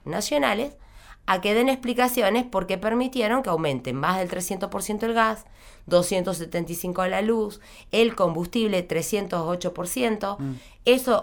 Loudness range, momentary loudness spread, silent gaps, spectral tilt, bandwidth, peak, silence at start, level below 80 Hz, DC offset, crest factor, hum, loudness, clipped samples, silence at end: 2 LU; 8 LU; none; -4.5 dB/octave; over 20 kHz; -6 dBFS; 0.05 s; -50 dBFS; under 0.1%; 18 dB; none; -24 LUFS; under 0.1%; 0 s